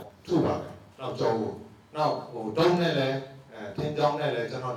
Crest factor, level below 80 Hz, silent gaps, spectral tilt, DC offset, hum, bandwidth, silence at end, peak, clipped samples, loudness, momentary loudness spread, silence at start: 18 dB; -62 dBFS; none; -6.5 dB/octave; under 0.1%; none; 13.5 kHz; 0 s; -10 dBFS; under 0.1%; -28 LUFS; 15 LU; 0 s